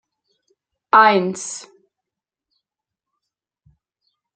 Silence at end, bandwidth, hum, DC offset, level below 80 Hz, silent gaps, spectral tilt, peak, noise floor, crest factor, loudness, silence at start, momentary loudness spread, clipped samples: 2.75 s; 9.4 kHz; none; under 0.1%; -72 dBFS; none; -3.5 dB/octave; -2 dBFS; -86 dBFS; 22 dB; -16 LUFS; 0.95 s; 18 LU; under 0.1%